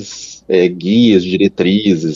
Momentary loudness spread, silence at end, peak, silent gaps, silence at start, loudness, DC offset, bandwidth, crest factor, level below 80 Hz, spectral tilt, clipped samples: 9 LU; 0 s; 0 dBFS; none; 0 s; -12 LUFS; under 0.1%; 7.6 kHz; 12 dB; -52 dBFS; -6 dB/octave; under 0.1%